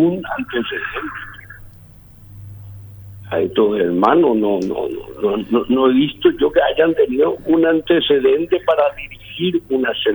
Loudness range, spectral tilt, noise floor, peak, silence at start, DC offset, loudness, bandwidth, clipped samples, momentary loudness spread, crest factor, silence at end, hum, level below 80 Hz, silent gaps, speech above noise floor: 9 LU; -7 dB/octave; -42 dBFS; 0 dBFS; 0 s; under 0.1%; -17 LUFS; over 20 kHz; under 0.1%; 20 LU; 16 dB; 0 s; none; -46 dBFS; none; 26 dB